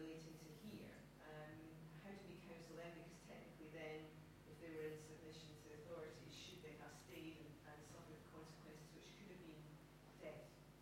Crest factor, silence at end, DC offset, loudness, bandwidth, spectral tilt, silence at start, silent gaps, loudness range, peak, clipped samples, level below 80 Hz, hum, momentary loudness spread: 18 dB; 0 s; under 0.1%; -58 LUFS; 16 kHz; -5 dB/octave; 0 s; none; 3 LU; -40 dBFS; under 0.1%; -76 dBFS; none; 7 LU